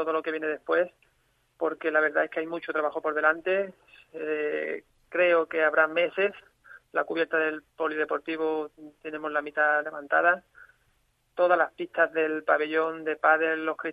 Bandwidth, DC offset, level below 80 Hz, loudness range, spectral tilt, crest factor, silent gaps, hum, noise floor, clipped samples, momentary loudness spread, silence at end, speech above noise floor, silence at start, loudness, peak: 4.9 kHz; under 0.1%; -74 dBFS; 2 LU; -6 dB/octave; 20 dB; none; none; -69 dBFS; under 0.1%; 10 LU; 0 s; 43 dB; 0 s; -27 LUFS; -8 dBFS